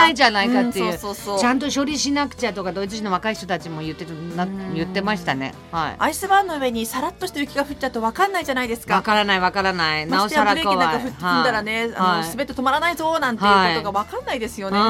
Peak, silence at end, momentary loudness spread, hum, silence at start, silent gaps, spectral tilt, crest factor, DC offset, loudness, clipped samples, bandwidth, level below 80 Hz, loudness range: -2 dBFS; 0 s; 9 LU; none; 0 s; none; -4 dB/octave; 18 dB; under 0.1%; -21 LUFS; under 0.1%; 17 kHz; -48 dBFS; 6 LU